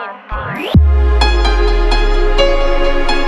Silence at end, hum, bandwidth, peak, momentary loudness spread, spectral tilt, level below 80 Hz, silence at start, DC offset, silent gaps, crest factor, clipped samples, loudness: 0 s; none; 10 kHz; 0 dBFS; 9 LU; -6 dB/octave; -12 dBFS; 0 s; under 0.1%; none; 10 dB; under 0.1%; -14 LUFS